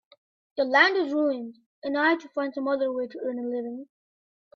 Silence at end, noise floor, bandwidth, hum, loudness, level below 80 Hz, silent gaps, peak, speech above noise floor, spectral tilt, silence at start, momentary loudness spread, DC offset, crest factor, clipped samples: 0.7 s; under -90 dBFS; 7 kHz; none; -25 LUFS; -76 dBFS; 1.66-1.82 s; -6 dBFS; over 64 dB; -4 dB/octave; 0.55 s; 18 LU; under 0.1%; 20 dB; under 0.1%